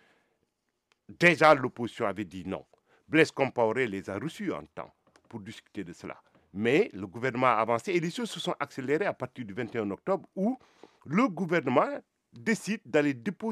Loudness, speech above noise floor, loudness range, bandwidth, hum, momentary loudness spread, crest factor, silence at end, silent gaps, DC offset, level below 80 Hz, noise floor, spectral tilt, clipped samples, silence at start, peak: -28 LUFS; 50 dB; 7 LU; 14.5 kHz; none; 18 LU; 24 dB; 0 s; none; under 0.1%; -72 dBFS; -79 dBFS; -5.5 dB/octave; under 0.1%; 1.1 s; -6 dBFS